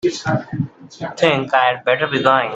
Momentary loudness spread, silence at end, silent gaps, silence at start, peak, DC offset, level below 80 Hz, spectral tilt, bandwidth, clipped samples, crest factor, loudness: 13 LU; 0 s; none; 0.05 s; 0 dBFS; under 0.1%; -56 dBFS; -5.5 dB/octave; 8.2 kHz; under 0.1%; 18 dB; -17 LUFS